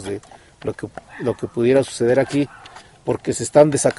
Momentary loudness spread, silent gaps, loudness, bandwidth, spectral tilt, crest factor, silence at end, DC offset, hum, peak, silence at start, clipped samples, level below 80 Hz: 16 LU; none; -19 LUFS; 11.5 kHz; -5.5 dB/octave; 20 dB; 0.05 s; under 0.1%; none; 0 dBFS; 0 s; under 0.1%; -52 dBFS